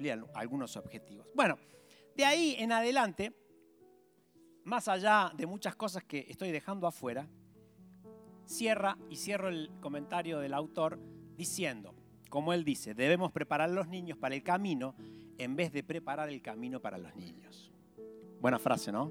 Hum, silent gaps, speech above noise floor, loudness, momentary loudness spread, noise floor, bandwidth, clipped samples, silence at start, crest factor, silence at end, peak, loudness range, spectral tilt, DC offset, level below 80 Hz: none; none; 31 dB; -35 LUFS; 21 LU; -66 dBFS; 18.5 kHz; under 0.1%; 0 s; 22 dB; 0 s; -14 dBFS; 6 LU; -4 dB/octave; under 0.1%; -76 dBFS